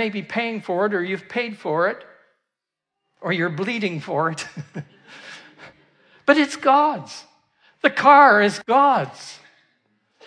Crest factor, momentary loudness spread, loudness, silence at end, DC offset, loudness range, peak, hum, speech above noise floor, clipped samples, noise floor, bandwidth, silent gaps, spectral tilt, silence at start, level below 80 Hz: 20 dB; 24 LU; -19 LUFS; 0.9 s; under 0.1%; 10 LU; -2 dBFS; none; 65 dB; under 0.1%; -84 dBFS; 10.5 kHz; none; -5 dB/octave; 0 s; -74 dBFS